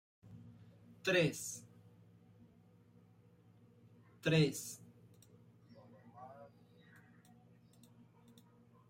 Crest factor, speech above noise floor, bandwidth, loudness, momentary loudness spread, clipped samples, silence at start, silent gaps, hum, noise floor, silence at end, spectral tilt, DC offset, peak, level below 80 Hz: 22 dB; 31 dB; 16 kHz; -36 LUFS; 29 LU; under 0.1%; 0.3 s; none; none; -66 dBFS; 2.45 s; -5 dB/octave; under 0.1%; -20 dBFS; -76 dBFS